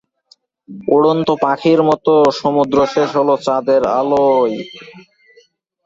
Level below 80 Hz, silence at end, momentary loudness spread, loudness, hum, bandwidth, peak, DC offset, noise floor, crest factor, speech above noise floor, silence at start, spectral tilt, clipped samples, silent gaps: -54 dBFS; 0.85 s; 4 LU; -14 LUFS; none; 7.8 kHz; -2 dBFS; under 0.1%; -54 dBFS; 14 dB; 40 dB; 0.7 s; -6.5 dB/octave; under 0.1%; none